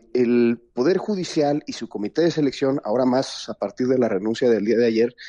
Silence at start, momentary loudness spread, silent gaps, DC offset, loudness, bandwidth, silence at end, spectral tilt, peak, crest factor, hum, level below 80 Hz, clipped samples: 0.15 s; 8 LU; none; under 0.1%; -22 LUFS; 10 kHz; 0 s; -6 dB/octave; -8 dBFS; 14 dB; none; -64 dBFS; under 0.1%